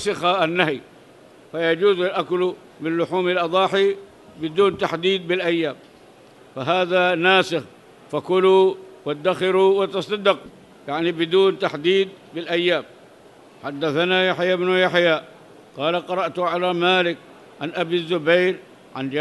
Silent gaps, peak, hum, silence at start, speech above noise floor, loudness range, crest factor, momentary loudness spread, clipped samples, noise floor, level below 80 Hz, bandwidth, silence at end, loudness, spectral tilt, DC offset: none; -2 dBFS; none; 0 s; 28 dB; 3 LU; 20 dB; 13 LU; under 0.1%; -48 dBFS; -66 dBFS; 11.5 kHz; 0 s; -20 LUFS; -5.5 dB/octave; under 0.1%